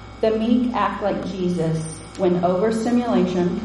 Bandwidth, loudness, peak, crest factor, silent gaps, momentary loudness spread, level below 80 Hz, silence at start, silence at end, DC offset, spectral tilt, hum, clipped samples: 11.5 kHz; -21 LUFS; -6 dBFS; 14 dB; none; 5 LU; -46 dBFS; 0 s; 0 s; under 0.1%; -7 dB/octave; none; under 0.1%